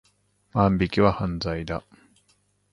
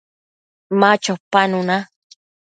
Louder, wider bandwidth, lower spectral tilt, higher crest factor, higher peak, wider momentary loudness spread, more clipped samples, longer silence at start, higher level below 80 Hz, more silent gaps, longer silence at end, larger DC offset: second, -24 LUFS vs -17 LUFS; first, 11 kHz vs 9.2 kHz; first, -7.5 dB/octave vs -4.5 dB/octave; about the same, 22 dB vs 20 dB; second, -4 dBFS vs 0 dBFS; first, 11 LU vs 8 LU; neither; second, 0.55 s vs 0.7 s; first, -42 dBFS vs -66 dBFS; second, none vs 1.20-1.31 s; first, 0.9 s vs 0.7 s; neither